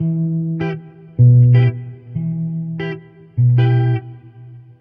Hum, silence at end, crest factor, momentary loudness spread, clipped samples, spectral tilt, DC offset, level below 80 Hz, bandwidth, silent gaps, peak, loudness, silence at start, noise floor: none; 0.2 s; 12 dB; 20 LU; under 0.1%; -11.5 dB/octave; under 0.1%; -48 dBFS; 3.4 kHz; none; -4 dBFS; -16 LUFS; 0 s; -39 dBFS